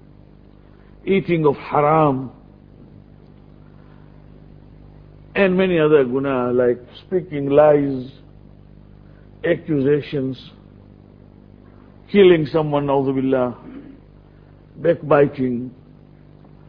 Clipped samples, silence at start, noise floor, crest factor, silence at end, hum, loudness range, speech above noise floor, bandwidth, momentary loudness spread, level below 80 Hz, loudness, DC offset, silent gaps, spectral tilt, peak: under 0.1%; 1.05 s; -46 dBFS; 20 dB; 1 s; 50 Hz at -45 dBFS; 7 LU; 29 dB; 5.2 kHz; 14 LU; -50 dBFS; -18 LUFS; under 0.1%; none; -10.5 dB/octave; -2 dBFS